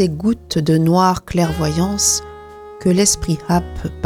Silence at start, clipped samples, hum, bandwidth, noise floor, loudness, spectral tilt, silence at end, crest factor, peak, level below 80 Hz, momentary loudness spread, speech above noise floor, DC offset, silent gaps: 0 s; under 0.1%; none; 17 kHz; -36 dBFS; -16 LUFS; -4.5 dB/octave; 0 s; 16 dB; -2 dBFS; -34 dBFS; 10 LU; 19 dB; under 0.1%; none